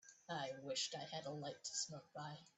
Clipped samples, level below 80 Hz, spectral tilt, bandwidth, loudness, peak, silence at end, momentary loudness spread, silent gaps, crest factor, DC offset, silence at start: under 0.1%; -88 dBFS; -2.5 dB/octave; 8.4 kHz; -46 LUFS; -28 dBFS; 0.05 s; 9 LU; none; 20 dB; under 0.1%; 0.05 s